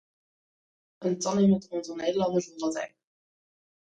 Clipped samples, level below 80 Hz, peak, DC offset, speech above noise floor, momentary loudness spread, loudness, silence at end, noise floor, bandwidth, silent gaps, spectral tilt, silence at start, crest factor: under 0.1%; -68 dBFS; -14 dBFS; under 0.1%; over 63 dB; 12 LU; -28 LUFS; 0.95 s; under -90 dBFS; 9.2 kHz; none; -6 dB/octave; 1 s; 16 dB